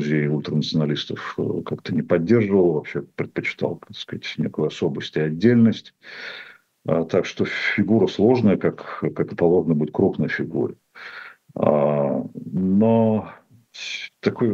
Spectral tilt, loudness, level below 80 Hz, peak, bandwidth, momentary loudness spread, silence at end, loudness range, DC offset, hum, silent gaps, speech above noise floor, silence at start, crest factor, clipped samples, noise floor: -7.5 dB/octave; -22 LUFS; -60 dBFS; -2 dBFS; 7.4 kHz; 16 LU; 0 s; 3 LU; under 0.1%; none; none; 19 dB; 0 s; 18 dB; under 0.1%; -40 dBFS